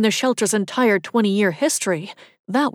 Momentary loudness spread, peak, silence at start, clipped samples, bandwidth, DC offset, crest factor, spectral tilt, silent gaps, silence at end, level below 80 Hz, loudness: 6 LU; -6 dBFS; 0 s; under 0.1%; 16.5 kHz; under 0.1%; 14 dB; -4 dB/octave; 2.39-2.44 s; 0 s; -76 dBFS; -20 LUFS